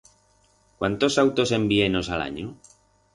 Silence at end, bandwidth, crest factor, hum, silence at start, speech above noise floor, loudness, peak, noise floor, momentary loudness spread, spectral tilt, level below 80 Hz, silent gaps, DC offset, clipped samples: 0.6 s; 11.5 kHz; 18 dB; 50 Hz at -45 dBFS; 0.8 s; 39 dB; -23 LUFS; -6 dBFS; -62 dBFS; 12 LU; -5 dB/octave; -48 dBFS; none; under 0.1%; under 0.1%